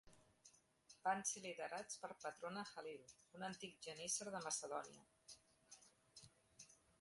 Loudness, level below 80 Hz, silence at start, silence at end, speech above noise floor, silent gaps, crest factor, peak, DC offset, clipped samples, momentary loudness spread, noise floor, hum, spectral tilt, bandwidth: -48 LUFS; -86 dBFS; 0.05 s; 0.25 s; 23 dB; none; 22 dB; -30 dBFS; under 0.1%; under 0.1%; 21 LU; -73 dBFS; none; -2 dB/octave; 11.5 kHz